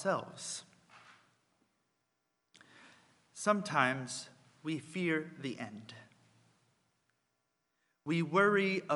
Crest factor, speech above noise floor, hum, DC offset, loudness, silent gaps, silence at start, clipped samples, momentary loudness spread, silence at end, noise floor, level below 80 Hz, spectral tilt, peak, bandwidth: 26 dB; 49 dB; none; under 0.1%; -34 LUFS; none; 0 s; under 0.1%; 21 LU; 0 s; -83 dBFS; -86 dBFS; -4.5 dB/octave; -12 dBFS; 11.5 kHz